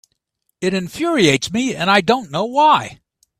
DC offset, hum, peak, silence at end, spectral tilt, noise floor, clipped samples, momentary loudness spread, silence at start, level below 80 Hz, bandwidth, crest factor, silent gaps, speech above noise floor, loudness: under 0.1%; none; 0 dBFS; 0.45 s; -4 dB/octave; -71 dBFS; under 0.1%; 8 LU; 0.6 s; -54 dBFS; 15 kHz; 18 dB; none; 54 dB; -16 LUFS